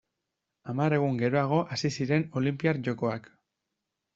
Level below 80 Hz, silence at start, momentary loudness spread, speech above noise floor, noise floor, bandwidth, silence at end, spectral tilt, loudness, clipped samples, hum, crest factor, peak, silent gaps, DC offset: -66 dBFS; 0.65 s; 7 LU; 57 dB; -84 dBFS; 7.8 kHz; 0.95 s; -6.5 dB/octave; -28 LUFS; under 0.1%; none; 18 dB; -12 dBFS; none; under 0.1%